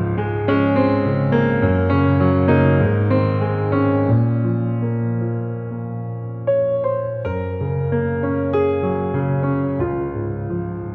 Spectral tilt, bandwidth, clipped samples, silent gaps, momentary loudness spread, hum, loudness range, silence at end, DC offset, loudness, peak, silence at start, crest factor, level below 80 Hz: -11.5 dB/octave; 4.6 kHz; under 0.1%; none; 9 LU; none; 5 LU; 0 s; under 0.1%; -19 LUFS; -4 dBFS; 0 s; 14 dB; -44 dBFS